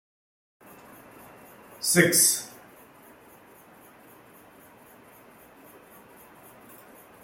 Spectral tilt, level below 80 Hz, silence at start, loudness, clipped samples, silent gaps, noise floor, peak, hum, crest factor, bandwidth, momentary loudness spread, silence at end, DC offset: -2.5 dB/octave; -70 dBFS; 1.8 s; -21 LUFS; under 0.1%; none; -53 dBFS; -4 dBFS; none; 28 dB; 16.5 kHz; 31 LU; 4.75 s; under 0.1%